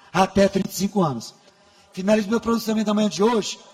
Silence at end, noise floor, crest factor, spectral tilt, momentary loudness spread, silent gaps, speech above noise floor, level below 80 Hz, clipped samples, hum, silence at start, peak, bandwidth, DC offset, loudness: 0.15 s; -54 dBFS; 18 dB; -5.5 dB/octave; 9 LU; none; 33 dB; -50 dBFS; under 0.1%; none; 0.15 s; -4 dBFS; 16 kHz; under 0.1%; -21 LUFS